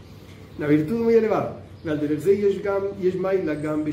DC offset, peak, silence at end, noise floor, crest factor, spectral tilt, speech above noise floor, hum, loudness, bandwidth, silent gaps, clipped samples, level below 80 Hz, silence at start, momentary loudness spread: under 0.1%; -8 dBFS; 0 s; -43 dBFS; 16 dB; -8 dB/octave; 21 dB; none; -23 LUFS; 15.5 kHz; none; under 0.1%; -54 dBFS; 0 s; 11 LU